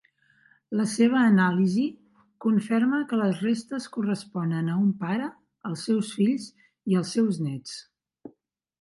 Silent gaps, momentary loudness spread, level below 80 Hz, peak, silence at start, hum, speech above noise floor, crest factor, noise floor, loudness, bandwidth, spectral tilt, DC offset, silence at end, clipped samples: none; 15 LU; -72 dBFS; -10 dBFS; 0.7 s; none; 40 dB; 16 dB; -65 dBFS; -25 LUFS; 11.5 kHz; -6.5 dB/octave; under 0.1%; 0.55 s; under 0.1%